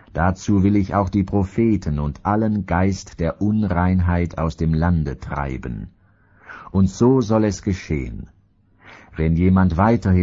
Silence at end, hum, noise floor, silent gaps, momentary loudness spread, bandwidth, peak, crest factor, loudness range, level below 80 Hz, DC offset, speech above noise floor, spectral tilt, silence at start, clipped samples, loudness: 0 s; none; -57 dBFS; none; 11 LU; 7.6 kHz; -2 dBFS; 18 dB; 2 LU; -34 dBFS; under 0.1%; 38 dB; -8 dB/octave; 0.15 s; under 0.1%; -20 LUFS